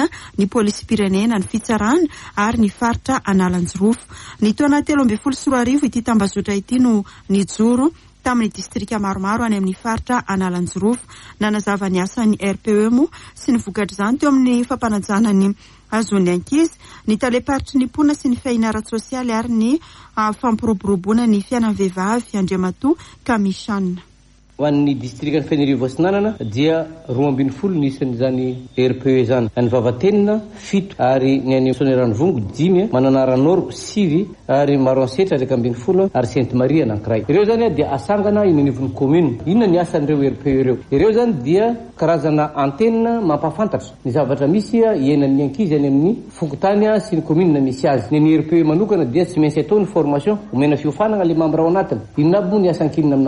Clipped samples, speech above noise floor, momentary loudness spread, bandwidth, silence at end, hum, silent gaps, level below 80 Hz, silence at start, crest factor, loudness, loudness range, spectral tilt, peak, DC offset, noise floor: under 0.1%; 33 dB; 6 LU; 11.5 kHz; 0 s; none; none; -44 dBFS; 0 s; 14 dB; -17 LUFS; 3 LU; -7 dB/octave; -4 dBFS; under 0.1%; -49 dBFS